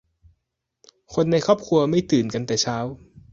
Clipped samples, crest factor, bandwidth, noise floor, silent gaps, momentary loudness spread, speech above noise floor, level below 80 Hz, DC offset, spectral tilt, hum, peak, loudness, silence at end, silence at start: under 0.1%; 20 dB; 7.8 kHz; -79 dBFS; none; 10 LU; 58 dB; -54 dBFS; under 0.1%; -5.5 dB/octave; none; -4 dBFS; -22 LUFS; 0.35 s; 1.1 s